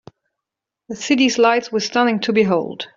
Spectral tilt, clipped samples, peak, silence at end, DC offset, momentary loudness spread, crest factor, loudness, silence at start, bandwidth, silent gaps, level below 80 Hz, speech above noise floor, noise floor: -4 dB/octave; under 0.1%; -2 dBFS; 0.1 s; under 0.1%; 8 LU; 16 dB; -17 LUFS; 0.9 s; 7.6 kHz; none; -62 dBFS; 66 dB; -84 dBFS